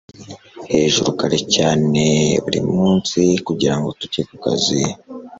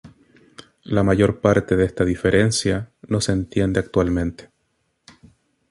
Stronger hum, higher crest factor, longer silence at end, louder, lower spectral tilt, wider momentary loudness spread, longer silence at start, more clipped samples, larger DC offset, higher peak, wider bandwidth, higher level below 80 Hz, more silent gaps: neither; about the same, 16 dB vs 18 dB; second, 0.05 s vs 1.3 s; first, -17 LUFS vs -20 LUFS; second, -4.5 dB/octave vs -6 dB/octave; first, 10 LU vs 7 LU; first, 0.2 s vs 0.05 s; neither; neither; about the same, -2 dBFS vs -2 dBFS; second, 8 kHz vs 11.5 kHz; second, -48 dBFS vs -40 dBFS; neither